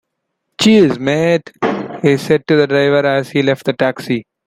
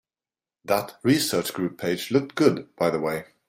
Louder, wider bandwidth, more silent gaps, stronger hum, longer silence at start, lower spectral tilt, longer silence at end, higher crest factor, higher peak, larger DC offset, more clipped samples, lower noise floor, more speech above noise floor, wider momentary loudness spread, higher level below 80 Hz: first, -14 LUFS vs -24 LUFS; about the same, 16 kHz vs 16 kHz; neither; neither; about the same, 0.6 s vs 0.65 s; about the same, -6 dB/octave vs -5 dB/octave; about the same, 0.25 s vs 0.25 s; second, 14 dB vs 20 dB; first, 0 dBFS vs -4 dBFS; neither; neither; second, -73 dBFS vs under -90 dBFS; second, 60 dB vs over 66 dB; about the same, 8 LU vs 7 LU; first, -54 dBFS vs -64 dBFS